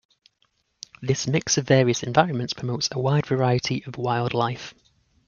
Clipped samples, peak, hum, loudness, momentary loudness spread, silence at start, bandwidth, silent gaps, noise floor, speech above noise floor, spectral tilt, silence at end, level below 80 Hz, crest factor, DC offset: under 0.1%; -2 dBFS; none; -23 LUFS; 14 LU; 1 s; 7.4 kHz; none; -69 dBFS; 46 dB; -5 dB/octave; 0.55 s; -58 dBFS; 22 dB; under 0.1%